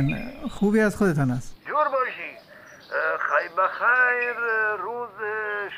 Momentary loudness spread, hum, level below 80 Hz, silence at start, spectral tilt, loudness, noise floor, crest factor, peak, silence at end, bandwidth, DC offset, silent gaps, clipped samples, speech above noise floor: 12 LU; none; -48 dBFS; 0 s; -6.5 dB/octave; -24 LUFS; -47 dBFS; 16 dB; -8 dBFS; 0 s; 15.5 kHz; under 0.1%; none; under 0.1%; 24 dB